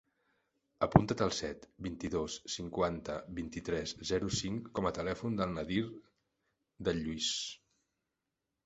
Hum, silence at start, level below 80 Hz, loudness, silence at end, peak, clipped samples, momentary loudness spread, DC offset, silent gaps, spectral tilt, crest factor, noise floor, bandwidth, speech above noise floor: none; 0.8 s; -56 dBFS; -36 LUFS; 1.1 s; -6 dBFS; under 0.1%; 13 LU; under 0.1%; none; -5 dB/octave; 32 dB; -88 dBFS; 8 kHz; 53 dB